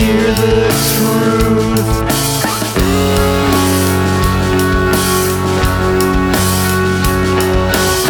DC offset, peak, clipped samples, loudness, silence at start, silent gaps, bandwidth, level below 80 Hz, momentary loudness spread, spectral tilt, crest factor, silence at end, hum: under 0.1%; 0 dBFS; under 0.1%; -12 LUFS; 0 s; none; over 20 kHz; -24 dBFS; 2 LU; -4.5 dB/octave; 12 dB; 0 s; none